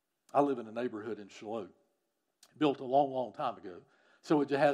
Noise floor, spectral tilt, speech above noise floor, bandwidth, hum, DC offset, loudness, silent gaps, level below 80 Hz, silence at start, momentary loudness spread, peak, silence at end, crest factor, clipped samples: -82 dBFS; -6.5 dB/octave; 50 dB; 11 kHz; none; under 0.1%; -34 LUFS; none; -88 dBFS; 0.35 s; 16 LU; -14 dBFS; 0 s; 20 dB; under 0.1%